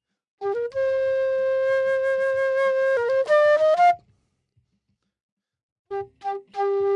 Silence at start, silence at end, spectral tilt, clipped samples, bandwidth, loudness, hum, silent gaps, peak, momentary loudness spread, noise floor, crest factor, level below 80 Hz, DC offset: 0.4 s; 0 s; -4 dB/octave; under 0.1%; 9.6 kHz; -22 LUFS; none; 5.23-5.37 s, 5.63-5.85 s; -10 dBFS; 14 LU; -74 dBFS; 12 dB; -68 dBFS; under 0.1%